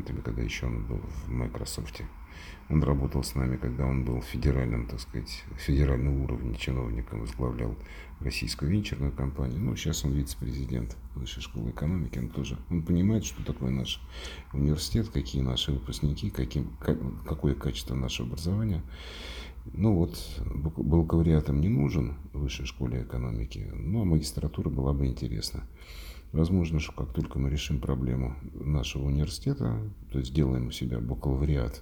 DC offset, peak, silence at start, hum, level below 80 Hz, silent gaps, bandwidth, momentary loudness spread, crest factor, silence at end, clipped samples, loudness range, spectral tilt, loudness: under 0.1%; -10 dBFS; 0 s; none; -36 dBFS; none; 19.5 kHz; 11 LU; 18 dB; 0 s; under 0.1%; 4 LU; -6.5 dB/octave; -31 LUFS